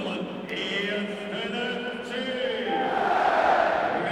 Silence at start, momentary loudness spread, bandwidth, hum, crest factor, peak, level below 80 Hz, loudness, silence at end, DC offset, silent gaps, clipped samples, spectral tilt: 0 s; 10 LU; 12.5 kHz; none; 16 dB; -10 dBFS; -62 dBFS; -26 LUFS; 0 s; under 0.1%; none; under 0.1%; -5 dB/octave